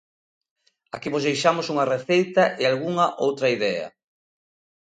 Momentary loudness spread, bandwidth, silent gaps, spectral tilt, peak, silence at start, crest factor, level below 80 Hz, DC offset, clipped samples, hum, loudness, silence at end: 10 LU; 9.4 kHz; none; -5 dB/octave; -6 dBFS; 0.95 s; 18 dB; -70 dBFS; under 0.1%; under 0.1%; none; -22 LUFS; 0.95 s